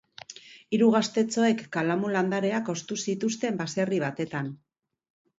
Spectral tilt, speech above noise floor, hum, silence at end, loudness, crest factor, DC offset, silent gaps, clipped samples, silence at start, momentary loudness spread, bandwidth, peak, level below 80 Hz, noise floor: -5 dB/octave; 21 dB; none; 0.85 s; -27 LUFS; 18 dB; under 0.1%; none; under 0.1%; 0.3 s; 14 LU; 8 kHz; -10 dBFS; -72 dBFS; -48 dBFS